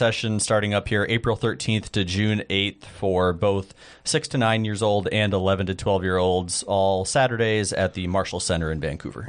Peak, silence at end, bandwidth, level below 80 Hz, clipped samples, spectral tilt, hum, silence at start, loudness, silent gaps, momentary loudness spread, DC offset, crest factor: -6 dBFS; 0 s; 10 kHz; -46 dBFS; under 0.1%; -4.5 dB/octave; none; 0 s; -23 LUFS; none; 4 LU; under 0.1%; 18 dB